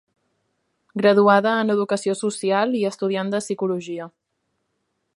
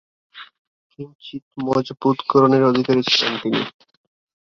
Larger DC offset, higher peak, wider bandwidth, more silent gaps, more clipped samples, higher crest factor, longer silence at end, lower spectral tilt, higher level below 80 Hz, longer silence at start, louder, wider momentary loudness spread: neither; about the same, -2 dBFS vs -2 dBFS; first, 11.5 kHz vs 7.2 kHz; second, none vs 0.59-0.90 s, 1.15-1.19 s, 1.42-1.51 s; neither; about the same, 20 dB vs 20 dB; first, 1.1 s vs 0.8 s; about the same, -5 dB/octave vs -5.5 dB/octave; second, -72 dBFS vs -62 dBFS; first, 0.95 s vs 0.35 s; about the same, -20 LUFS vs -18 LUFS; second, 15 LU vs 21 LU